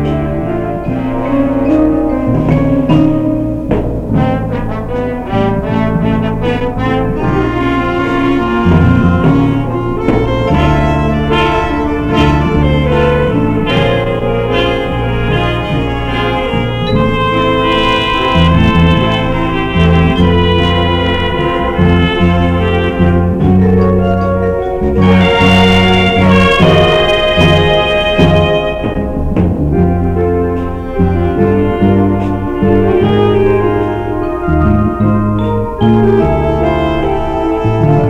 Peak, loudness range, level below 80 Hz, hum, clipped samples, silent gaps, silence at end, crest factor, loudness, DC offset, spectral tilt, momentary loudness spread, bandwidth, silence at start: 0 dBFS; 5 LU; -22 dBFS; none; under 0.1%; none; 0 s; 10 dB; -11 LUFS; under 0.1%; -7.5 dB/octave; 7 LU; 10.5 kHz; 0 s